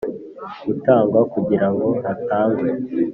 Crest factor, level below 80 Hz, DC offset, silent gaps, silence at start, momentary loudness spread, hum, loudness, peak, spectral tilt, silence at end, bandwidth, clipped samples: 16 dB; -58 dBFS; under 0.1%; none; 0 s; 14 LU; none; -19 LUFS; -2 dBFS; -8 dB/octave; 0 s; 5.4 kHz; under 0.1%